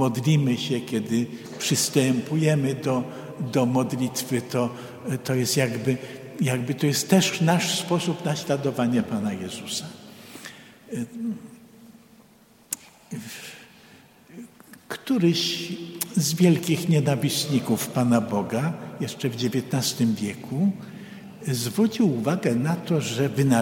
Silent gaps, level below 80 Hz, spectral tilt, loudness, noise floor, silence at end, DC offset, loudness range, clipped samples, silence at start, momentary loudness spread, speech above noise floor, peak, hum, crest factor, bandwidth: none; -66 dBFS; -5 dB/octave; -24 LUFS; -55 dBFS; 0 s; under 0.1%; 13 LU; under 0.1%; 0 s; 16 LU; 31 dB; -2 dBFS; none; 24 dB; 16.5 kHz